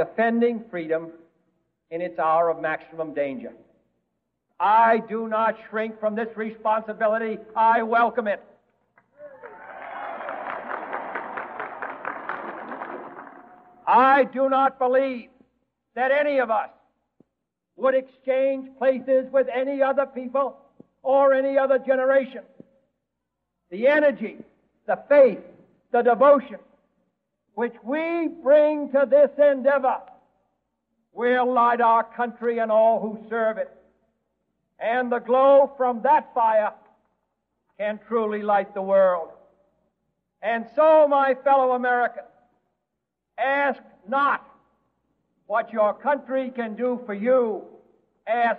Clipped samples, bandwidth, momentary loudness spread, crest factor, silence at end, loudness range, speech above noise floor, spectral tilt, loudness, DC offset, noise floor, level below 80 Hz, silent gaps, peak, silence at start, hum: under 0.1%; 4.5 kHz; 16 LU; 18 dB; 0 s; 6 LU; 60 dB; -8 dB/octave; -22 LUFS; under 0.1%; -81 dBFS; -74 dBFS; none; -6 dBFS; 0 s; none